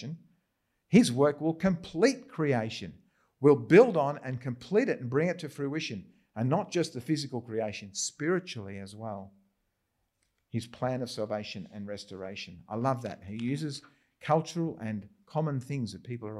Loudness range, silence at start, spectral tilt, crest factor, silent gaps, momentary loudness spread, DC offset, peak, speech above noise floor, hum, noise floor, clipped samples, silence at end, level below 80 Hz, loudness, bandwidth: 11 LU; 0 s; -6 dB/octave; 24 dB; none; 16 LU; under 0.1%; -8 dBFS; 50 dB; none; -79 dBFS; under 0.1%; 0 s; -68 dBFS; -30 LUFS; 12.5 kHz